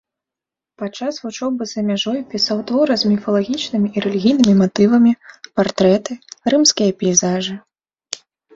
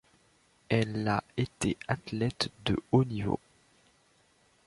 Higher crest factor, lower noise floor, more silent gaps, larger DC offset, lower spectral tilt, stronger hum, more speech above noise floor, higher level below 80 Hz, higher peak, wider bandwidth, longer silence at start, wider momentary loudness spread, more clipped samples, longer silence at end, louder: about the same, 18 dB vs 22 dB; first, -87 dBFS vs -67 dBFS; neither; neither; second, -4.5 dB/octave vs -6 dB/octave; neither; first, 70 dB vs 36 dB; about the same, -56 dBFS vs -54 dBFS; first, 0 dBFS vs -10 dBFS; second, 8 kHz vs 11.5 kHz; about the same, 0.8 s vs 0.7 s; first, 15 LU vs 7 LU; neither; second, 0.4 s vs 1.3 s; first, -17 LUFS vs -31 LUFS